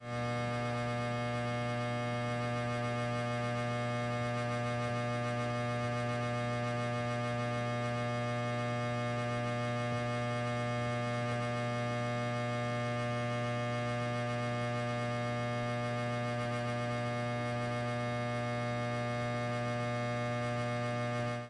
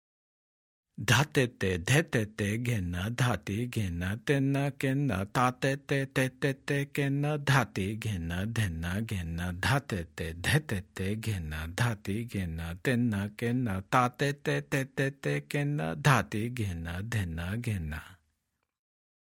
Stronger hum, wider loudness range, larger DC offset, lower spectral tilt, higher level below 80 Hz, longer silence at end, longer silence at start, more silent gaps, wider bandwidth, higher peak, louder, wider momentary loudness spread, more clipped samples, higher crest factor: neither; second, 0 LU vs 3 LU; neither; about the same, -6 dB/octave vs -5.5 dB/octave; second, -62 dBFS vs -54 dBFS; second, 0 s vs 1.2 s; second, 0 s vs 1 s; neither; second, 11 kHz vs 17 kHz; second, -24 dBFS vs -8 dBFS; second, -35 LUFS vs -31 LUFS; second, 1 LU vs 9 LU; neither; second, 12 dB vs 22 dB